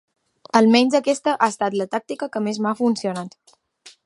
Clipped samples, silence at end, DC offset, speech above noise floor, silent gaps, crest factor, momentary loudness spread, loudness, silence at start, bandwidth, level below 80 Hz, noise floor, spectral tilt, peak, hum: under 0.1%; 0.15 s; under 0.1%; 31 dB; none; 20 dB; 13 LU; -20 LUFS; 0.55 s; 11.5 kHz; -74 dBFS; -50 dBFS; -4.5 dB/octave; 0 dBFS; none